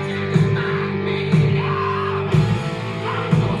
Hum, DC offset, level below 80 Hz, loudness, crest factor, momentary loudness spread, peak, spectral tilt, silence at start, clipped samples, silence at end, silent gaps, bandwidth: none; under 0.1%; -42 dBFS; -20 LUFS; 14 dB; 6 LU; -4 dBFS; -7.5 dB/octave; 0 s; under 0.1%; 0 s; none; 10 kHz